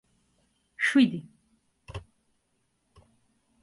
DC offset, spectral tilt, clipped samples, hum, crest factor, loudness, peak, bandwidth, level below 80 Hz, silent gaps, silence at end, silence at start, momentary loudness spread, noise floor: under 0.1%; -5 dB/octave; under 0.1%; none; 22 dB; -24 LUFS; -10 dBFS; 11.5 kHz; -60 dBFS; none; 1.6 s; 0.8 s; 22 LU; -74 dBFS